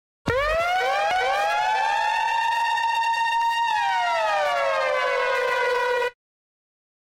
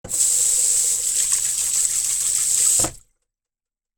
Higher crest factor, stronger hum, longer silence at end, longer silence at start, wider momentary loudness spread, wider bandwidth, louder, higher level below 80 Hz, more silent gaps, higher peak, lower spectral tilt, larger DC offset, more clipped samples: about the same, 14 dB vs 18 dB; neither; about the same, 0.9 s vs 1 s; first, 0.25 s vs 0.05 s; second, 1 LU vs 4 LU; about the same, 16.5 kHz vs 17.5 kHz; second, -22 LUFS vs -17 LUFS; about the same, -50 dBFS vs -50 dBFS; neither; second, -10 dBFS vs -2 dBFS; first, -2.5 dB/octave vs 1 dB/octave; neither; neither